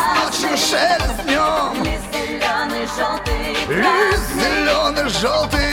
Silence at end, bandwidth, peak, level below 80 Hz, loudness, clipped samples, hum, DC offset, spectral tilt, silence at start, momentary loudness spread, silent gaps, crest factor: 0 s; 18 kHz; -2 dBFS; -30 dBFS; -18 LUFS; under 0.1%; none; under 0.1%; -3 dB/octave; 0 s; 6 LU; none; 16 dB